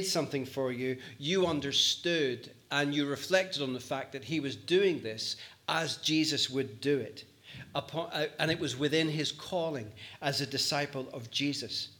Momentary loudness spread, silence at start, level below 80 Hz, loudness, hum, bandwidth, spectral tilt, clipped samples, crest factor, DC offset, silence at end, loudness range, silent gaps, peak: 10 LU; 0 s; -74 dBFS; -32 LUFS; none; 19 kHz; -3.5 dB/octave; under 0.1%; 22 dB; under 0.1%; 0.05 s; 3 LU; none; -12 dBFS